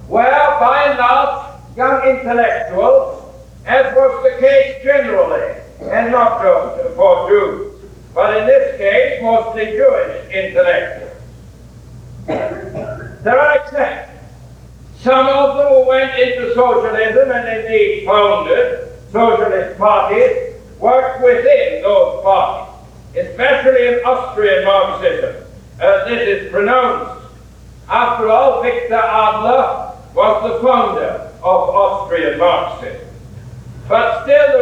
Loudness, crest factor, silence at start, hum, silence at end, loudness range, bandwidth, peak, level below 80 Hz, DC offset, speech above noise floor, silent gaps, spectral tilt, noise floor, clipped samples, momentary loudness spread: -13 LUFS; 14 dB; 0 s; none; 0 s; 4 LU; 8 kHz; 0 dBFS; -42 dBFS; under 0.1%; 25 dB; none; -5.5 dB/octave; -38 dBFS; under 0.1%; 14 LU